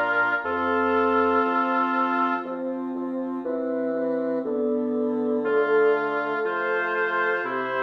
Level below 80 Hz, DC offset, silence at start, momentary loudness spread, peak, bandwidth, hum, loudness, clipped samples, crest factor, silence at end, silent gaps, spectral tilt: -66 dBFS; under 0.1%; 0 s; 8 LU; -10 dBFS; 6 kHz; none; -24 LUFS; under 0.1%; 14 dB; 0 s; none; -7 dB/octave